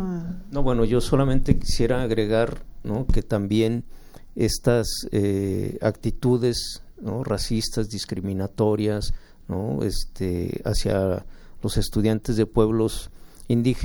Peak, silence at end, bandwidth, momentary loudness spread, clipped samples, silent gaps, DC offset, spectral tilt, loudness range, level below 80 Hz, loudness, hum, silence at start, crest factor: -2 dBFS; 0 s; 18 kHz; 10 LU; under 0.1%; none; under 0.1%; -6 dB/octave; 3 LU; -32 dBFS; -24 LUFS; none; 0 s; 20 dB